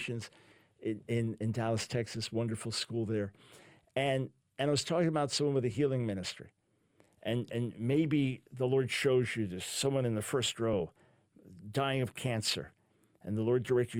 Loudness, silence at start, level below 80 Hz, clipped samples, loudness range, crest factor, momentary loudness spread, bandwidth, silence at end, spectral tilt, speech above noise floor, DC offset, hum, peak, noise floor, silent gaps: -34 LUFS; 0 s; -66 dBFS; under 0.1%; 4 LU; 16 dB; 10 LU; 16.5 kHz; 0 s; -5 dB/octave; 37 dB; under 0.1%; none; -18 dBFS; -70 dBFS; none